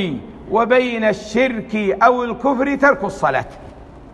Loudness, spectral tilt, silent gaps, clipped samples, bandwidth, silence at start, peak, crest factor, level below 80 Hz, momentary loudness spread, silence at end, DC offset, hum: -17 LUFS; -5.5 dB/octave; none; under 0.1%; 10 kHz; 0 s; 0 dBFS; 18 dB; -44 dBFS; 8 LU; 0 s; under 0.1%; none